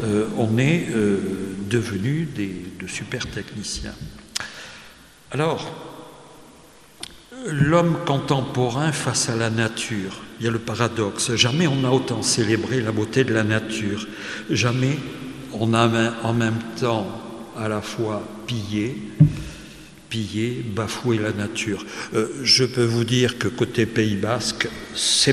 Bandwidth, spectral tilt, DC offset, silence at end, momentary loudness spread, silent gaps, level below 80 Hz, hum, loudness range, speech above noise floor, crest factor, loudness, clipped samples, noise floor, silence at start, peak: 13.5 kHz; -4.5 dB/octave; 0.1%; 0 s; 14 LU; none; -50 dBFS; none; 8 LU; 26 dB; 22 dB; -22 LUFS; under 0.1%; -48 dBFS; 0 s; -2 dBFS